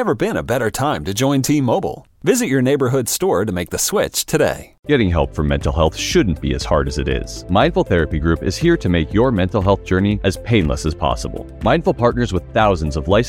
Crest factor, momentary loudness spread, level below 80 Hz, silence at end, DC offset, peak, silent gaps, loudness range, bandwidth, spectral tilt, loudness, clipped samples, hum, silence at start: 16 dB; 5 LU; -30 dBFS; 0 s; under 0.1%; -2 dBFS; 4.79-4.83 s; 1 LU; 17 kHz; -5.5 dB/octave; -18 LUFS; under 0.1%; none; 0 s